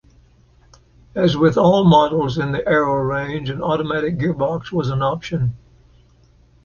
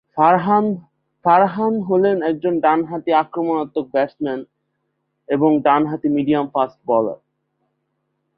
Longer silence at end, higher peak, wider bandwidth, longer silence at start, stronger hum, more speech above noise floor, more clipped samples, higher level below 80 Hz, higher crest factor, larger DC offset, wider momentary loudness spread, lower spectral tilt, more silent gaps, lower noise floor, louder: about the same, 1.1 s vs 1.2 s; about the same, -2 dBFS vs -2 dBFS; first, 7 kHz vs 5 kHz; first, 1.15 s vs 0.15 s; neither; second, 35 dB vs 55 dB; neither; first, -46 dBFS vs -64 dBFS; about the same, 16 dB vs 18 dB; neither; about the same, 10 LU vs 9 LU; second, -7.5 dB/octave vs -11 dB/octave; neither; second, -52 dBFS vs -72 dBFS; about the same, -18 LUFS vs -18 LUFS